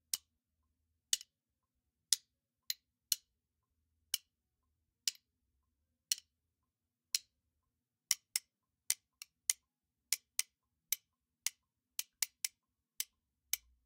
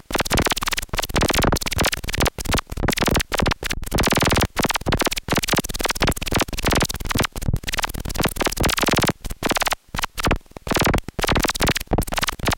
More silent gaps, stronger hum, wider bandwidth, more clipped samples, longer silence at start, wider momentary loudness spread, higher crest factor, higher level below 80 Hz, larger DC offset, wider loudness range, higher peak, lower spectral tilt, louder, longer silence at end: neither; neither; about the same, 16.5 kHz vs 17.5 kHz; neither; about the same, 0.15 s vs 0.1 s; first, 8 LU vs 5 LU; first, 36 dB vs 16 dB; second, -84 dBFS vs -30 dBFS; neither; first, 4 LU vs 1 LU; second, -8 dBFS vs -4 dBFS; second, 4.5 dB/octave vs -3.5 dB/octave; second, -39 LUFS vs -21 LUFS; first, 0.3 s vs 0 s